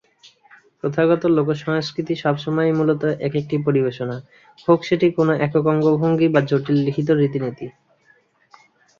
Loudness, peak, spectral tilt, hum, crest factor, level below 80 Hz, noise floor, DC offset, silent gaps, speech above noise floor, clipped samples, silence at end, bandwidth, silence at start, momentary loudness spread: -19 LUFS; -2 dBFS; -8 dB/octave; none; 18 dB; -60 dBFS; -58 dBFS; under 0.1%; none; 39 dB; under 0.1%; 1.3 s; 7.2 kHz; 0.85 s; 10 LU